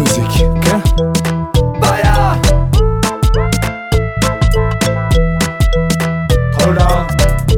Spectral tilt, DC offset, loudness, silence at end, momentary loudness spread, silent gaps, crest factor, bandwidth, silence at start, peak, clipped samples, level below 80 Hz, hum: -5.5 dB/octave; under 0.1%; -13 LUFS; 0 s; 4 LU; none; 12 dB; 17 kHz; 0 s; 0 dBFS; under 0.1%; -16 dBFS; none